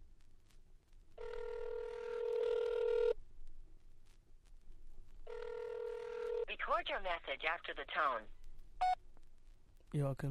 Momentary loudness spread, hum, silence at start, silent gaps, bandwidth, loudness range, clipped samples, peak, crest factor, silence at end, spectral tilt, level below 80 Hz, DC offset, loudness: 11 LU; none; 0 s; none; 11.5 kHz; 6 LU; under 0.1%; -22 dBFS; 20 dB; 0 s; -6 dB/octave; -54 dBFS; under 0.1%; -40 LUFS